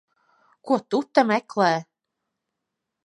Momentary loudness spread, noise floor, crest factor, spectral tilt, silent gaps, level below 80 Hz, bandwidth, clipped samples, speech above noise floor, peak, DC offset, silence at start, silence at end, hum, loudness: 5 LU; -83 dBFS; 22 dB; -5.5 dB/octave; none; -80 dBFS; 11 kHz; under 0.1%; 61 dB; -2 dBFS; under 0.1%; 0.65 s; 1.2 s; none; -23 LUFS